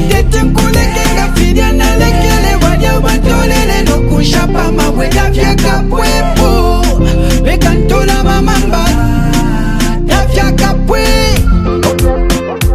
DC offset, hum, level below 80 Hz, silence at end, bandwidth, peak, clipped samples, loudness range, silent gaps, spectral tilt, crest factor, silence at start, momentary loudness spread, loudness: under 0.1%; none; -12 dBFS; 0 s; 15.5 kHz; 0 dBFS; 0.8%; 1 LU; none; -5 dB/octave; 8 dB; 0 s; 2 LU; -10 LUFS